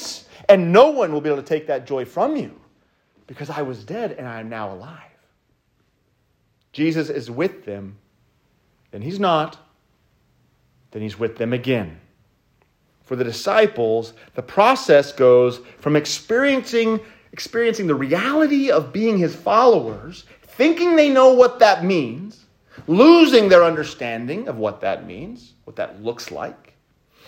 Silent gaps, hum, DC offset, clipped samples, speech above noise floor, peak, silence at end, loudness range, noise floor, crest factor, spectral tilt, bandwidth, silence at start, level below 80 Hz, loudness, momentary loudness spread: none; none; under 0.1%; under 0.1%; 47 dB; 0 dBFS; 0.75 s; 13 LU; -65 dBFS; 18 dB; -5.5 dB/octave; 16 kHz; 0 s; -62 dBFS; -18 LUFS; 21 LU